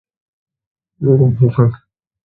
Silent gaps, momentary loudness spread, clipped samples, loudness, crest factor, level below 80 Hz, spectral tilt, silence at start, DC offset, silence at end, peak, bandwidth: none; 5 LU; under 0.1%; -14 LUFS; 16 dB; -46 dBFS; -14 dB/octave; 1 s; under 0.1%; 0.5 s; 0 dBFS; 3.7 kHz